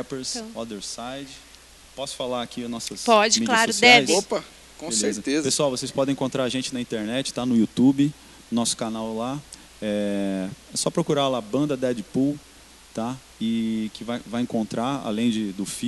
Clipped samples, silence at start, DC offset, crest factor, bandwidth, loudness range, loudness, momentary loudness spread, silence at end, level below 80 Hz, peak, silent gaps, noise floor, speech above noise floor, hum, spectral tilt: under 0.1%; 0 s; under 0.1%; 24 dB; 12.5 kHz; 8 LU; -23 LUFS; 14 LU; 0 s; -56 dBFS; 0 dBFS; none; -48 dBFS; 25 dB; none; -3.5 dB/octave